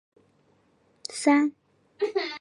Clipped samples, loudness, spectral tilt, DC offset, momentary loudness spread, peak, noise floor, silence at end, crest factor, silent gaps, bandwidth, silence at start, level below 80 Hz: under 0.1%; -26 LUFS; -2.5 dB/octave; under 0.1%; 15 LU; -8 dBFS; -65 dBFS; 0 s; 20 dB; none; 11.5 kHz; 1.1 s; -82 dBFS